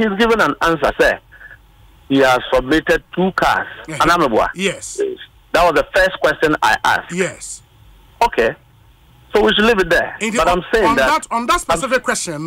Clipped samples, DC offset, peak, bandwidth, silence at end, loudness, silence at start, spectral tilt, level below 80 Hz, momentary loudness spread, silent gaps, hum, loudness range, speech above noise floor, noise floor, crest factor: under 0.1%; under 0.1%; -2 dBFS; 16 kHz; 0 s; -15 LUFS; 0 s; -3.5 dB/octave; -38 dBFS; 9 LU; none; none; 2 LU; 32 dB; -48 dBFS; 14 dB